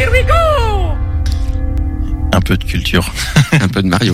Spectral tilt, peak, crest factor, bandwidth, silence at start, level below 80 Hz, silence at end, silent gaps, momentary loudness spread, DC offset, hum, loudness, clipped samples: -5.5 dB/octave; 0 dBFS; 12 dB; 15.5 kHz; 0 s; -18 dBFS; 0 s; none; 8 LU; under 0.1%; none; -14 LUFS; under 0.1%